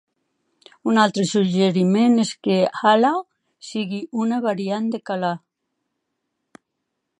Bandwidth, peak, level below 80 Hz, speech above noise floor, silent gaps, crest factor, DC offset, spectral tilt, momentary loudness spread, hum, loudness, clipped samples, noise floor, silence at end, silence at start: 10.5 kHz; -4 dBFS; -72 dBFS; 59 dB; none; 18 dB; under 0.1%; -5.5 dB/octave; 11 LU; none; -20 LUFS; under 0.1%; -78 dBFS; 1.85 s; 0.85 s